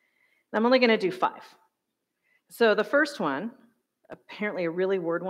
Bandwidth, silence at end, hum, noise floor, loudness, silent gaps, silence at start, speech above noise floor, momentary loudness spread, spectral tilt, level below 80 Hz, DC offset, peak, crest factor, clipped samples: 15.5 kHz; 0 s; none; -82 dBFS; -25 LUFS; none; 0.55 s; 56 dB; 12 LU; -5.5 dB/octave; -82 dBFS; under 0.1%; -8 dBFS; 20 dB; under 0.1%